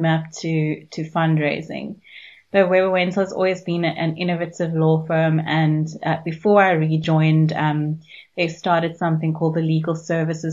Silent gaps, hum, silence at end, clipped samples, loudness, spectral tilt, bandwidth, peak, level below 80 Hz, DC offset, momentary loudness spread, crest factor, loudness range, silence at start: none; none; 0 s; under 0.1%; -20 LUFS; -7 dB/octave; 7.6 kHz; -2 dBFS; -64 dBFS; under 0.1%; 9 LU; 18 dB; 3 LU; 0 s